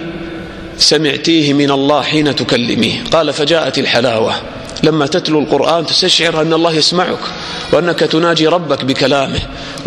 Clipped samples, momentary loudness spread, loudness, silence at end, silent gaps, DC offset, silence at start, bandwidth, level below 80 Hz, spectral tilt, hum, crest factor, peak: under 0.1%; 11 LU; -12 LUFS; 0 s; none; under 0.1%; 0 s; 15 kHz; -40 dBFS; -4 dB/octave; none; 12 dB; 0 dBFS